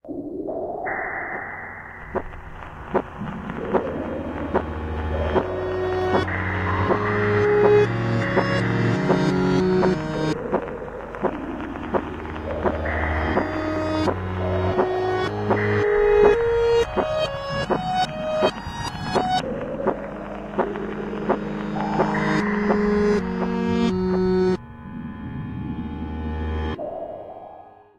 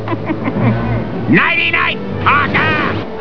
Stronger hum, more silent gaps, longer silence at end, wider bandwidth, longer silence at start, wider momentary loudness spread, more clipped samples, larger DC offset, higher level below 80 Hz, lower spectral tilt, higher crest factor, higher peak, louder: neither; neither; first, 0.3 s vs 0 s; first, 10.5 kHz vs 5.4 kHz; about the same, 0.05 s vs 0 s; first, 12 LU vs 8 LU; neither; second, under 0.1% vs 4%; about the same, -38 dBFS vs -36 dBFS; about the same, -7 dB/octave vs -8 dB/octave; about the same, 18 dB vs 14 dB; second, -4 dBFS vs 0 dBFS; second, -23 LUFS vs -14 LUFS